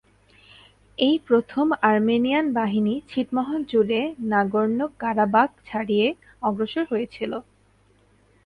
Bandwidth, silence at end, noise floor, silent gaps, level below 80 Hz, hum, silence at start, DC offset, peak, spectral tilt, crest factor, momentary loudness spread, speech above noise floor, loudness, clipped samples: 5.2 kHz; 1.05 s; -60 dBFS; none; -60 dBFS; none; 1 s; under 0.1%; -4 dBFS; -7.5 dB/octave; 20 dB; 8 LU; 37 dB; -23 LUFS; under 0.1%